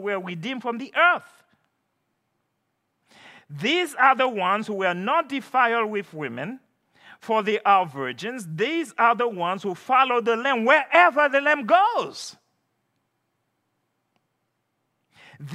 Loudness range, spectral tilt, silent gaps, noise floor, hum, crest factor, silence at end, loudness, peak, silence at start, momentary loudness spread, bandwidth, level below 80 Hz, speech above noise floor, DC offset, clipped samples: 7 LU; -4.5 dB/octave; none; -76 dBFS; none; 22 dB; 0 s; -22 LUFS; -2 dBFS; 0 s; 13 LU; 15 kHz; -86 dBFS; 53 dB; under 0.1%; under 0.1%